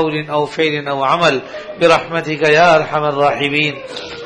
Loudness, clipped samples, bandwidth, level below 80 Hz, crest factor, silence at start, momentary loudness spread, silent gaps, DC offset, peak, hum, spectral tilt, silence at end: -14 LUFS; under 0.1%; 10.5 kHz; -52 dBFS; 14 dB; 0 s; 10 LU; none; under 0.1%; 0 dBFS; none; -5 dB/octave; 0 s